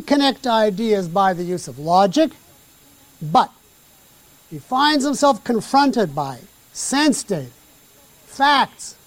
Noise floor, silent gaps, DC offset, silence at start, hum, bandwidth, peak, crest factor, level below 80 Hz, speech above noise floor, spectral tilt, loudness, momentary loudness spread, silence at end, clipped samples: -51 dBFS; none; under 0.1%; 0 s; none; 17 kHz; -2 dBFS; 16 dB; -58 dBFS; 33 dB; -4 dB/octave; -18 LUFS; 14 LU; 0.15 s; under 0.1%